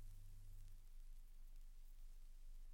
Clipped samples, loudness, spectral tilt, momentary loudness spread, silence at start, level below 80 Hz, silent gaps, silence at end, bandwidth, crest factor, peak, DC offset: under 0.1%; -66 LUFS; -4 dB/octave; 2 LU; 0 s; -56 dBFS; none; 0 s; 16.5 kHz; 8 dB; -48 dBFS; under 0.1%